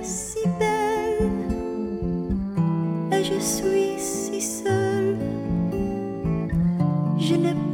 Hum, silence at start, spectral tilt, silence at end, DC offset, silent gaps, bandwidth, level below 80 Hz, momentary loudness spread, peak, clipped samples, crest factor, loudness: none; 0 s; -5.5 dB/octave; 0 s; under 0.1%; none; 17.5 kHz; -40 dBFS; 5 LU; -10 dBFS; under 0.1%; 14 dB; -24 LUFS